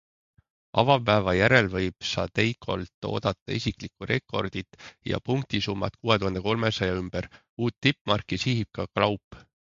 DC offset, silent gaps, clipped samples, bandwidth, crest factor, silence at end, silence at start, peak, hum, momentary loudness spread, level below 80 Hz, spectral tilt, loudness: under 0.1%; 2.94-3.02 s, 3.42-3.46 s, 7.49-7.57 s, 8.01-8.05 s, 9.24-9.31 s; under 0.1%; 7.6 kHz; 22 dB; 0.25 s; 0.75 s; -4 dBFS; none; 11 LU; -48 dBFS; -5.5 dB/octave; -26 LUFS